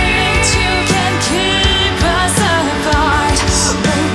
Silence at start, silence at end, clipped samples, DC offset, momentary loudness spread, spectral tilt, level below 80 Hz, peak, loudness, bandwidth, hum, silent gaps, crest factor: 0 s; 0 s; under 0.1%; under 0.1%; 2 LU; -3.5 dB/octave; -24 dBFS; 0 dBFS; -12 LUFS; 12 kHz; none; none; 12 dB